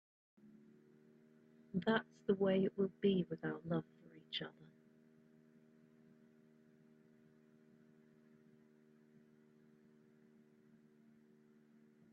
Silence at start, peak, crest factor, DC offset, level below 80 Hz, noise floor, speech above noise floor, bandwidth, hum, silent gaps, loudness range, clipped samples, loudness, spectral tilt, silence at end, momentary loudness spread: 1.75 s; -20 dBFS; 26 dB; under 0.1%; -82 dBFS; -68 dBFS; 30 dB; 6.2 kHz; none; none; 15 LU; under 0.1%; -39 LUFS; -5 dB/octave; 7.45 s; 17 LU